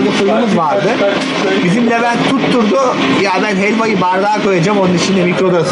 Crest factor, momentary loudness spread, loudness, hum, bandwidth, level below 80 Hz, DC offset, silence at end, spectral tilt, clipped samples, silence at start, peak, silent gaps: 10 dB; 1 LU; -12 LUFS; none; 10.5 kHz; -52 dBFS; under 0.1%; 0 s; -5.5 dB/octave; under 0.1%; 0 s; -2 dBFS; none